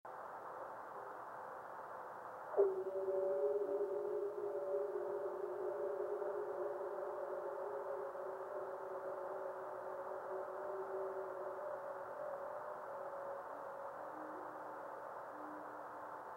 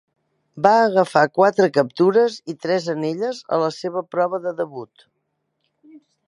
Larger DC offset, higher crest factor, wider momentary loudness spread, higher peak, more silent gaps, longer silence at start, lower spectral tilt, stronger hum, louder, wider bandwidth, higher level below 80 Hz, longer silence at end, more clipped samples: neither; about the same, 24 dB vs 20 dB; about the same, 11 LU vs 11 LU; second, -20 dBFS vs 0 dBFS; neither; second, 0.05 s vs 0.55 s; about the same, -6.5 dB/octave vs -6 dB/octave; neither; second, -44 LUFS vs -19 LUFS; first, 16.5 kHz vs 11.5 kHz; second, -88 dBFS vs -72 dBFS; second, 0 s vs 0.35 s; neither